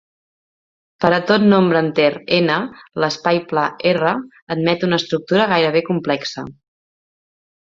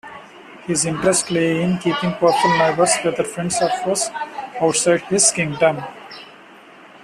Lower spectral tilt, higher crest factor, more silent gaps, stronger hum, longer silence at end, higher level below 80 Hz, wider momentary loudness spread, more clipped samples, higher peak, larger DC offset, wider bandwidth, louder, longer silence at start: first, -6 dB/octave vs -3.5 dB/octave; about the same, 18 dB vs 18 dB; first, 4.42-4.47 s vs none; neither; first, 1.2 s vs 0.05 s; about the same, -60 dBFS vs -56 dBFS; second, 9 LU vs 18 LU; neither; about the same, 0 dBFS vs -2 dBFS; neither; second, 7.6 kHz vs 14 kHz; about the same, -17 LUFS vs -18 LUFS; first, 1 s vs 0.05 s